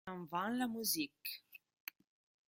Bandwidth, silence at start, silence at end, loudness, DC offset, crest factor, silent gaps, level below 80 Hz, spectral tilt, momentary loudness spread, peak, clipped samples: 16.5 kHz; 0.05 s; 0.9 s; -39 LUFS; under 0.1%; 22 dB; none; -82 dBFS; -2.5 dB/octave; 15 LU; -22 dBFS; under 0.1%